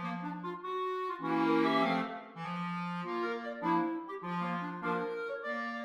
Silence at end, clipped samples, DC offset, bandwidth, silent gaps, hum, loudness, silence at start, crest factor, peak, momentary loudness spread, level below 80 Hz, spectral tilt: 0 s; under 0.1%; under 0.1%; 10.5 kHz; none; none; -35 LUFS; 0 s; 16 dB; -18 dBFS; 10 LU; -82 dBFS; -7 dB/octave